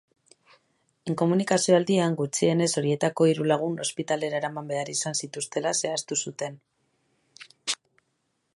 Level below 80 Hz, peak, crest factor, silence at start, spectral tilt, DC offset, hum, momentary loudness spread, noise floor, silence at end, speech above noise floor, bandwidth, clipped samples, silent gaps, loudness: -74 dBFS; -8 dBFS; 20 dB; 1.05 s; -4.5 dB/octave; under 0.1%; none; 11 LU; -75 dBFS; 0.8 s; 50 dB; 11.5 kHz; under 0.1%; none; -26 LUFS